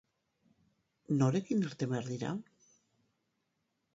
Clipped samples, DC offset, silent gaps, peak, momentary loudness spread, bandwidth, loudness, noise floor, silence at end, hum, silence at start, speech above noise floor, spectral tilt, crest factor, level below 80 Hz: under 0.1%; under 0.1%; none; -16 dBFS; 9 LU; 8 kHz; -34 LUFS; -82 dBFS; 1.55 s; none; 1.1 s; 49 dB; -7 dB/octave; 22 dB; -76 dBFS